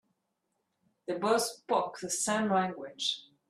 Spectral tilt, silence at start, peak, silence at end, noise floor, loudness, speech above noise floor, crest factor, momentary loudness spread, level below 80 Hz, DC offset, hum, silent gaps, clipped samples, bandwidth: -3 dB/octave; 1.1 s; -14 dBFS; 0.3 s; -81 dBFS; -31 LUFS; 50 dB; 18 dB; 7 LU; -76 dBFS; under 0.1%; none; none; under 0.1%; 14 kHz